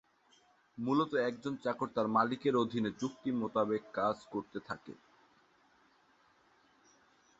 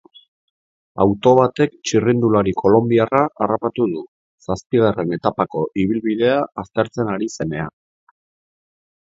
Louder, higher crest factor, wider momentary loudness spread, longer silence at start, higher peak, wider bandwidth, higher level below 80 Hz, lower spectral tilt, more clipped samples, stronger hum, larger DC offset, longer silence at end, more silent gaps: second, -35 LUFS vs -18 LUFS; about the same, 20 dB vs 18 dB; about the same, 13 LU vs 11 LU; second, 0.75 s vs 0.95 s; second, -16 dBFS vs 0 dBFS; about the same, 8 kHz vs 7.8 kHz; second, -74 dBFS vs -50 dBFS; second, -5 dB/octave vs -6.5 dB/octave; neither; neither; neither; first, 2.45 s vs 1.5 s; second, none vs 4.08-4.38 s, 4.66-4.70 s